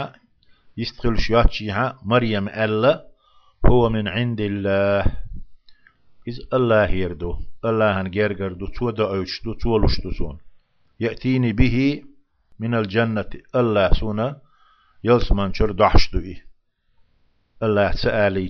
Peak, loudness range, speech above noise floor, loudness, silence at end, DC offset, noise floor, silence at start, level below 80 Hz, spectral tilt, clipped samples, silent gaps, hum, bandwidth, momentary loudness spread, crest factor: 0 dBFS; 3 LU; 43 dB; -21 LUFS; 0 s; under 0.1%; -61 dBFS; 0 s; -28 dBFS; -7.5 dB/octave; under 0.1%; none; none; 6.4 kHz; 12 LU; 20 dB